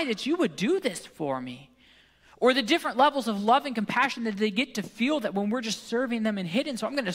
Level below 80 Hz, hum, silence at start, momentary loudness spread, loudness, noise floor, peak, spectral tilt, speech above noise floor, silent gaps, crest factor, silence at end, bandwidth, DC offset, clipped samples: -70 dBFS; none; 0 s; 9 LU; -27 LUFS; -59 dBFS; -10 dBFS; -4.5 dB/octave; 32 dB; none; 18 dB; 0 s; 16 kHz; under 0.1%; under 0.1%